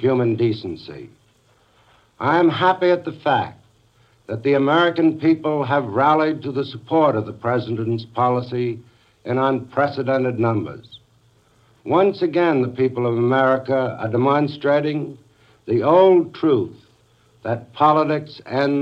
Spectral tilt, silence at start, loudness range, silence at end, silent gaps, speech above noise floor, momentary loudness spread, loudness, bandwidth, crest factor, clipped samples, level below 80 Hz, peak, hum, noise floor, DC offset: -8.5 dB/octave; 0 s; 3 LU; 0 s; none; 39 dB; 12 LU; -19 LUFS; 6.8 kHz; 16 dB; under 0.1%; -64 dBFS; -2 dBFS; none; -58 dBFS; under 0.1%